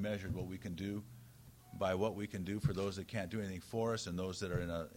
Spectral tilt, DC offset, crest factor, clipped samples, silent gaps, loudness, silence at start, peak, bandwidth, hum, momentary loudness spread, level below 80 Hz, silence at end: -6 dB/octave; under 0.1%; 18 dB; under 0.1%; none; -40 LUFS; 0 s; -22 dBFS; 16 kHz; none; 14 LU; -60 dBFS; 0 s